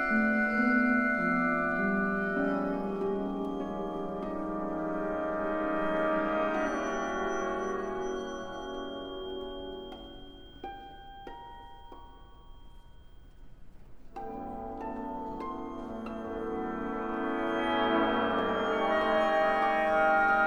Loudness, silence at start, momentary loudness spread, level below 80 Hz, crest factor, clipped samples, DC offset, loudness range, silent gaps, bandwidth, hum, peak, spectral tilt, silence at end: -31 LUFS; 0 s; 18 LU; -52 dBFS; 16 dB; under 0.1%; under 0.1%; 19 LU; none; over 20 kHz; none; -14 dBFS; -6 dB/octave; 0 s